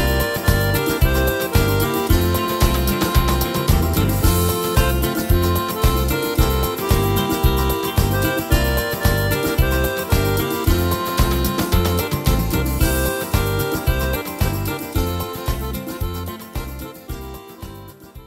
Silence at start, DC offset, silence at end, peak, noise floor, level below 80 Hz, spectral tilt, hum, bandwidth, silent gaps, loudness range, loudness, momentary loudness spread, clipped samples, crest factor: 0 s; under 0.1%; 0 s; 0 dBFS; -38 dBFS; -24 dBFS; -5 dB/octave; none; 16.5 kHz; none; 6 LU; -19 LUFS; 9 LU; under 0.1%; 18 dB